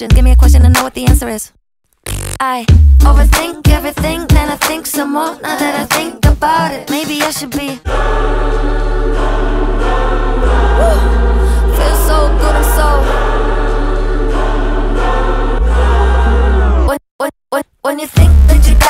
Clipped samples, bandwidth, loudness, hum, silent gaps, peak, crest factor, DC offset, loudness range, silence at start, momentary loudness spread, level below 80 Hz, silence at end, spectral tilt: under 0.1%; 16.5 kHz; -13 LUFS; none; 17.11-17.19 s; 0 dBFS; 10 dB; under 0.1%; 3 LU; 0 s; 10 LU; -12 dBFS; 0 s; -5.5 dB/octave